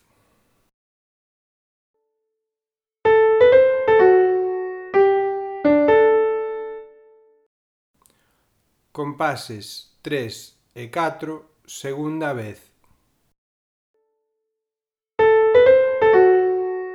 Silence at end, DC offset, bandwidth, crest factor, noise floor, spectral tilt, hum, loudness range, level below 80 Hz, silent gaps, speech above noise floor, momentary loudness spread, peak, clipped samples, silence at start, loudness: 0 s; under 0.1%; 13 kHz; 18 dB; under -90 dBFS; -6 dB/octave; none; 15 LU; -58 dBFS; 7.46-7.94 s, 13.38-13.94 s; over 63 dB; 21 LU; -2 dBFS; under 0.1%; 3.05 s; -17 LUFS